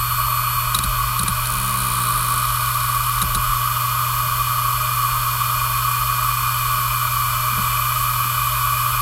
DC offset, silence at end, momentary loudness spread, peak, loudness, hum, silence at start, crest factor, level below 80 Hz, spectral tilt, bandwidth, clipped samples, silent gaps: under 0.1%; 0 s; 1 LU; -2 dBFS; -19 LUFS; none; 0 s; 16 dB; -34 dBFS; -2 dB/octave; 17 kHz; under 0.1%; none